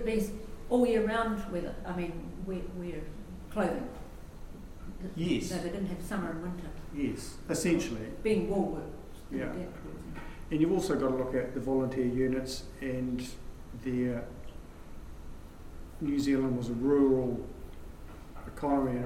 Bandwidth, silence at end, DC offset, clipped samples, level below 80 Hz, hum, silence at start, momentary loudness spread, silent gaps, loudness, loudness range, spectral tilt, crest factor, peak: 16 kHz; 0 s; under 0.1%; under 0.1%; -46 dBFS; none; 0 s; 21 LU; none; -33 LUFS; 6 LU; -6 dB/octave; 18 dB; -14 dBFS